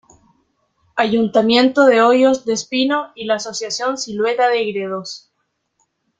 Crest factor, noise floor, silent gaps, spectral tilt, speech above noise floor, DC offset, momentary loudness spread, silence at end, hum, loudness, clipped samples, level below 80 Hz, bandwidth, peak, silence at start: 16 dB; -71 dBFS; none; -3.5 dB/octave; 55 dB; under 0.1%; 13 LU; 1 s; none; -16 LUFS; under 0.1%; -62 dBFS; 9.2 kHz; -2 dBFS; 0.95 s